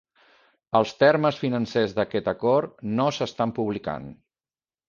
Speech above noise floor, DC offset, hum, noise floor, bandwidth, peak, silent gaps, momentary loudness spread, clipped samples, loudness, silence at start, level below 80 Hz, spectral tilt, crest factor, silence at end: over 66 dB; under 0.1%; none; under -90 dBFS; 7.2 kHz; -6 dBFS; none; 10 LU; under 0.1%; -24 LUFS; 0.75 s; -60 dBFS; -6.5 dB/octave; 20 dB; 0.75 s